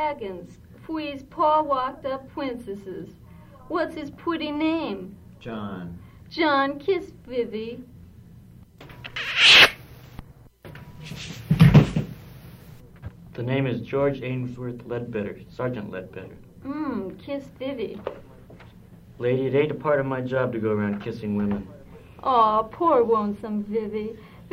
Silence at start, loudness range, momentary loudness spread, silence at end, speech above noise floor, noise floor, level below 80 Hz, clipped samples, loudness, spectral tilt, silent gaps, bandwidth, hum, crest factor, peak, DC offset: 0 s; 13 LU; 22 LU; 0 s; 22 dB; -48 dBFS; -48 dBFS; under 0.1%; -23 LUFS; -5.5 dB/octave; none; 16 kHz; none; 22 dB; -2 dBFS; under 0.1%